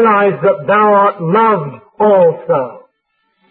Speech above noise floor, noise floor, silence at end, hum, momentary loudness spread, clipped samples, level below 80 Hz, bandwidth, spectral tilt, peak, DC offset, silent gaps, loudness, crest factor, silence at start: 54 dB; -65 dBFS; 0.75 s; none; 8 LU; under 0.1%; -62 dBFS; 4.3 kHz; -12.5 dB/octave; -2 dBFS; under 0.1%; none; -12 LUFS; 10 dB; 0 s